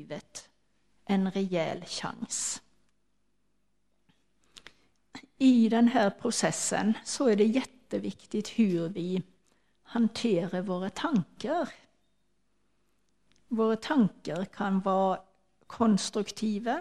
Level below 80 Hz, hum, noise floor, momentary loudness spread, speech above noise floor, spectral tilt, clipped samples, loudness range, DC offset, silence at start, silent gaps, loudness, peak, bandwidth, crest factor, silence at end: -68 dBFS; 50 Hz at -60 dBFS; -77 dBFS; 12 LU; 49 dB; -5 dB/octave; under 0.1%; 9 LU; under 0.1%; 0 s; none; -29 LUFS; -10 dBFS; 12.5 kHz; 20 dB; 0 s